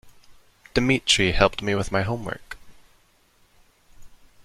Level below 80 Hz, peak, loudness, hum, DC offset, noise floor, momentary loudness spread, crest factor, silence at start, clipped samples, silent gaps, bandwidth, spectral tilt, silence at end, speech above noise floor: -40 dBFS; -2 dBFS; -22 LUFS; none; under 0.1%; -60 dBFS; 18 LU; 24 dB; 0.05 s; under 0.1%; none; 15 kHz; -4 dB/octave; 0.3 s; 39 dB